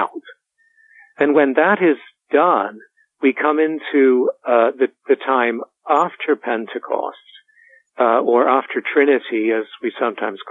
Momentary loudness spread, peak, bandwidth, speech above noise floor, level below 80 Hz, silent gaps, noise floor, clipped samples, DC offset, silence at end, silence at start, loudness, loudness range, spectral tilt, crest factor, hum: 10 LU; -2 dBFS; 7.2 kHz; 41 dB; -78 dBFS; none; -58 dBFS; under 0.1%; under 0.1%; 0 s; 0 s; -18 LUFS; 3 LU; -7 dB/octave; 16 dB; none